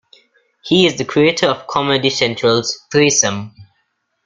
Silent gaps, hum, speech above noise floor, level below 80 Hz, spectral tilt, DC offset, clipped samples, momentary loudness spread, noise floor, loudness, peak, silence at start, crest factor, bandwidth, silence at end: none; none; 52 dB; -54 dBFS; -3 dB/octave; under 0.1%; under 0.1%; 6 LU; -67 dBFS; -15 LUFS; 0 dBFS; 0.65 s; 16 dB; 9.6 kHz; 0.65 s